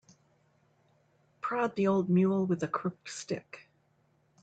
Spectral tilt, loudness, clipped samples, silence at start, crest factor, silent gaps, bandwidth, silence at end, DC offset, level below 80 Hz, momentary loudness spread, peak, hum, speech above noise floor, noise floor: -7 dB/octave; -31 LUFS; under 0.1%; 1.45 s; 16 dB; none; 8.8 kHz; 0.8 s; under 0.1%; -74 dBFS; 15 LU; -18 dBFS; none; 40 dB; -70 dBFS